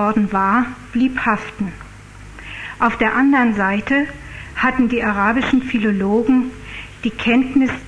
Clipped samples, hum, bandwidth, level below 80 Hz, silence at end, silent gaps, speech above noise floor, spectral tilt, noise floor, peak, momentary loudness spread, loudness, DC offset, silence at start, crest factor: under 0.1%; none; 10.5 kHz; -40 dBFS; 0 s; none; 21 dB; -6.5 dB/octave; -38 dBFS; -2 dBFS; 15 LU; -17 LUFS; under 0.1%; 0 s; 14 dB